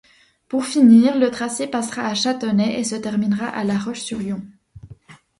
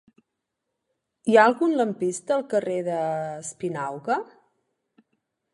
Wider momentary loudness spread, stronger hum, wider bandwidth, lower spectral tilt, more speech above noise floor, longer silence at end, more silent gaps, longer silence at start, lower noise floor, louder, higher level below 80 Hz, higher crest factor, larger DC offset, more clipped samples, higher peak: about the same, 14 LU vs 14 LU; neither; about the same, 11.5 kHz vs 11.5 kHz; about the same, -5 dB/octave vs -5 dB/octave; second, 27 dB vs 58 dB; second, 0.25 s vs 1.3 s; neither; second, 0.5 s vs 1.25 s; second, -45 dBFS vs -82 dBFS; first, -19 LUFS vs -24 LUFS; first, -58 dBFS vs -76 dBFS; about the same, 18 dB vs 22 dB; neither; neither; about the same, -2 dBFS vs -4 dBFS